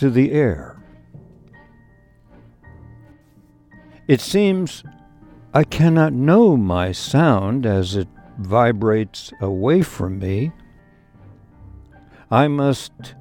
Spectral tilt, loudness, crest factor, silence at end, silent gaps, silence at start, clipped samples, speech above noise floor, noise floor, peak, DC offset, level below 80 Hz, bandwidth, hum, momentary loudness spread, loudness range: -7 dB/octave; -18 LUFS; 18 dB; 0.1 s; none; 0 s; under 0.1%; 35 dB; -52 dBFS; 0 dBFS; under 0.1%; -46 dBFS; 18 kHz; none; 14 LU; 7 LU